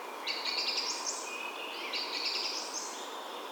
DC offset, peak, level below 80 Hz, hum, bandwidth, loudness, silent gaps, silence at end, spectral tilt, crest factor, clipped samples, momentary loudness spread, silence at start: under 0.1%; -18 dBFS; under -90 dBFS; none; 19.5 kHz; -34 LUFS; none; 0 s; 2 dB/octave; 18 dB; under 0.1%; 8 LU; 0 s